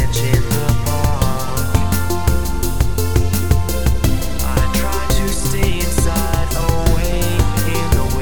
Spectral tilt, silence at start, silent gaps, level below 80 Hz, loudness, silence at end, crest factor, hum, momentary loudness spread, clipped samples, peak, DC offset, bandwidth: -5 dB/octave; 0 s; none; -20 dBFS; -18 LUFS; 0 s; 16 dB; none; 2 LU; under 0.1%; 0 dBFS; 9%; 19.5 kHz